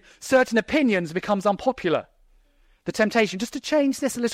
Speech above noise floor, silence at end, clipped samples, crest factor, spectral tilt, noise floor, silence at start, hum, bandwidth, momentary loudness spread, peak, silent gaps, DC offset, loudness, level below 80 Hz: 37 dB; 0 s; under 0.1%; 18 dB; -4.5 dB/octave; -59 dBFS; 0.2 s; none; 16 kHz; 6 LU; -6 dBFS; none; under 0.1%; -23 LUFS; -56 dBFS